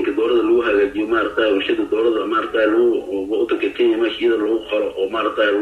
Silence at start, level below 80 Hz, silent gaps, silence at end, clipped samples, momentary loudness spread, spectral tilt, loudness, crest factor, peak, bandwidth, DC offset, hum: 0 s; -52 dBFS; none; 0 s; under 0.1%; 5 LU; -5.5 dB/octave; -18 LUFS; 12 dB; -6 dBFS; 5.6 kHz; under 0.1%; none